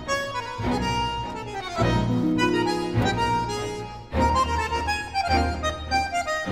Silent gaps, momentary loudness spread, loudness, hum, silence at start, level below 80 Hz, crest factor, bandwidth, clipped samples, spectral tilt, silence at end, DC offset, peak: none; 8 LU; -25 LUFS; none; 0 s; -36 dBFS; 16 dB; 16 kHz; under 0.1%; -5 dB/octave; 0 s; 0.2%; -8 dBFS